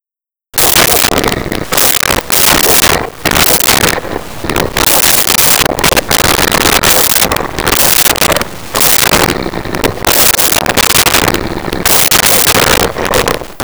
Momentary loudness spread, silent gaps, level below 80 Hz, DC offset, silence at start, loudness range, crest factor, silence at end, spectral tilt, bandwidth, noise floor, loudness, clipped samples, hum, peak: 10 LU; none; -28 dBFS; 2%; 0.55 s; 1 LU; 10 dB; 0 s; -1.5 dB/octave; over 20 kHz; -89 dBFS; -7 LUFS; under 0.1%; none; 0 dBFS